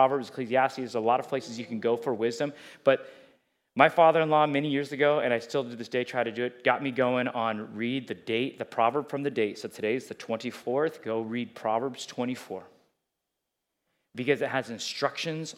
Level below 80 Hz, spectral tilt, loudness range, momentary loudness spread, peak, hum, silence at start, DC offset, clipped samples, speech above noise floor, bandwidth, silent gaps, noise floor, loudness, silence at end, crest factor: -84 dBFS; -5 dB/octave; 8 LU; 10 LU; -2 dBFS; none; 0 s; under 0.1%; under 0.1%; 56 dB; 15 kHz; none; -84 dBFS; -28 LUFS; 0.05 s; 26 dB